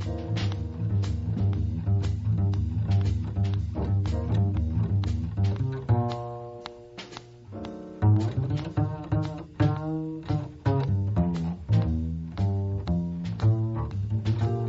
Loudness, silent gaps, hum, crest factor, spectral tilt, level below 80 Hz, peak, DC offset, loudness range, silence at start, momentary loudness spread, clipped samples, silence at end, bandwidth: -28 LUFS; none; none; 14 dB; -8.5 dB/octave; -38 dBFS; -12 dBFS; under 0.1%; 3 LU; 0 s; 11 LU; under 0.1%; 0 s; 7.4 kHz